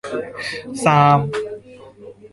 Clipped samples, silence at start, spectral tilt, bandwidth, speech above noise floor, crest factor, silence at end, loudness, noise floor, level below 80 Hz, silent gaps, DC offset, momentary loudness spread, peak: under 0.1%; 0.05 s; -6 dB/octave; 11.5 kHz; 24 dB; 18 dB; 0.05 s; -18 LUFS; -41 dBFS; -54 dBFS; none; under 0.1%; 16 LU; -2 dBFS